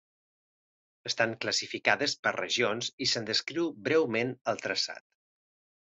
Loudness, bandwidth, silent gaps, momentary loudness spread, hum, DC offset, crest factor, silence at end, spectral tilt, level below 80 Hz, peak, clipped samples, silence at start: -29 LUFS; 8.2 kHz; 2.19-2.23 s, 2.93-2.98 s; 7 LU; none; under 0.1%; 24 dB; 0.9 s; -2.5 dB/octave; -76 dBFS; -8 dBFS; under 0.1%; 1.05 s